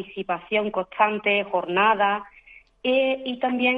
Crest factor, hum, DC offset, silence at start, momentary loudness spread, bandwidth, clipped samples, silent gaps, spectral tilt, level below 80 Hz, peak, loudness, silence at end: 18 dB; none; under 0.1%; 0 s; 10 LU; 5 kHz; under 0.1%; none; -7 dB/octave; -64 dBFS; -6 dBFS; -23 LUFS; 0 s